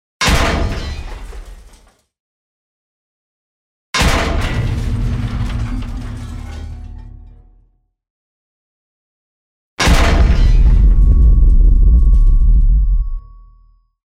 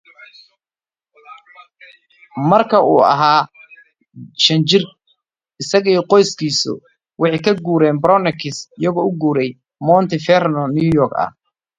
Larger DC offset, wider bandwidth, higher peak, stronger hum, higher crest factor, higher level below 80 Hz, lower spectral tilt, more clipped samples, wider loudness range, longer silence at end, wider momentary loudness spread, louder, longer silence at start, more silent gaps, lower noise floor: neither; first, 12.5 kHz vs 9.4 kHz; about the same, 0 dBFS vs 0 dBFS; neither; about the same, 14 dB vs 16 dB; first, -14 dBFS vs -54 dBFS; about the same, -5 dB/octave vs -5 dB/octave; neither; first, 18 LU vs 2 LU; first, 0.9 s vs 0.5 s; first, 18 LU vs 12 LU; about the same, -15 LUFS vs -15 LUFS; about the same, 0.2 s vs 0.2 s; first, 2.20-3.93 s, 8.10-9.77 s vs none; second, -55 dBFS vs -65 dBFS